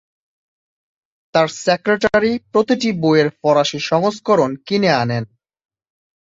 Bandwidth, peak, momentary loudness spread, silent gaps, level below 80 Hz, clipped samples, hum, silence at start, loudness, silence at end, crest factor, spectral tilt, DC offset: 7.8 kHz; -2 dBFS; 4 LU; none; -54 dBFS; under 0.1%; none; 1.35 s; -17 LUFS; 1.05 s; 16 dB; -5.5 dB/octave; under 0.1%